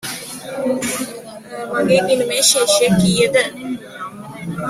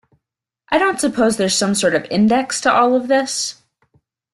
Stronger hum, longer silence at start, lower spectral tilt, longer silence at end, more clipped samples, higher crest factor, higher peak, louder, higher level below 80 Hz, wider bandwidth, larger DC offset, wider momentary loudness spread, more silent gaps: neither; second, 0.05 s vs 0.7 s; about the same, -3.5 dB/octave vs -3.5 dB/octave; second, 0 s vs 0.8 s; neither; about the same, 18 dB vs 16 dB; about the same, 0 dBFS vs -2 dBFS; about the same, -16 LUFS vs -16 LUFS; first, -50 dBFS vs -56 dBFS; first, 16 kHz vs 12.5 kHz; neither; first, 18 LU vs 6 LU; neither